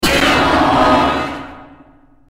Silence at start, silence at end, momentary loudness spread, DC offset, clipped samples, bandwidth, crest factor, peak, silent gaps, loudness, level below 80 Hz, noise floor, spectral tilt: 0 s; 0.65 s; 16 LU; under 0.1%; under 0.1%; 16 kHz; 14 dB; -2 dBFS; none; -13 LUFS; -32 dBFS; -46 dBFS; -4 dB/octave